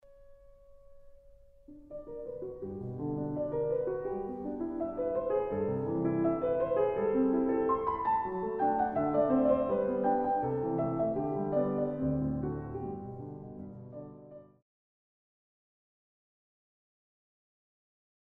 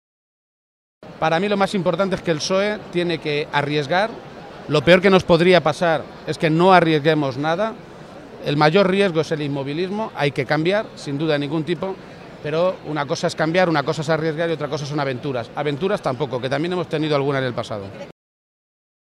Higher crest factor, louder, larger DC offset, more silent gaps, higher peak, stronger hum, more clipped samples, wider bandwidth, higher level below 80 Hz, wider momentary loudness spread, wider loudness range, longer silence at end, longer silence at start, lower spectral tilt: about the same, 18 dB vs 20 dB; second, -32 LUFS vs -20 LUFS; neither; neither; second, -16 dBFS vs 0 dBFS; neither; neither; second, 3.8 kHz vs 12.5 kHz; about the same, -58 dBFS vs -54 dBFS; about the same, 16 LU vs 15 LU; first, 14 LU vs 6 LU; first, 3.95 s vs 1 s; second, 0.1 s vs 1 s; first, -11.5 dB/octave vs -6 dB/octave